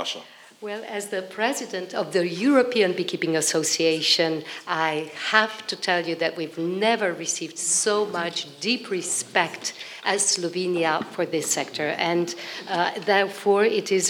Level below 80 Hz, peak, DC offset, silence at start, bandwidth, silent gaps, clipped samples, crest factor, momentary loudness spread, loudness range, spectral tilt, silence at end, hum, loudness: -88 dBFS; -2 dBFS; under 0.1%; 0 s; 19 kHz; none; under 0.1%; 22 dB; 9 LU; 3 LU; -2.5 dB/octave; 0 s; none; -23 LUFS